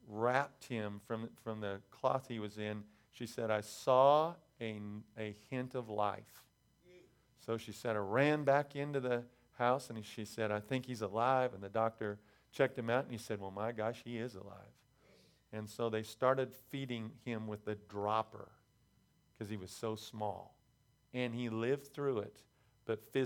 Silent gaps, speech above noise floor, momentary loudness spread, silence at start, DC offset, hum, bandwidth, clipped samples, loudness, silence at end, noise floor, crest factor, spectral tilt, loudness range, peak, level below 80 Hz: none; 35 dB; 15 LU; 0.05 s; under 0.1%; none; 18.5 kHz; under 0.1%; -38 LUFS; 0 s; -73 dBFS; 24 dB; -6 dB/octave; 8 LU; -16 dBFS; -78 dBFS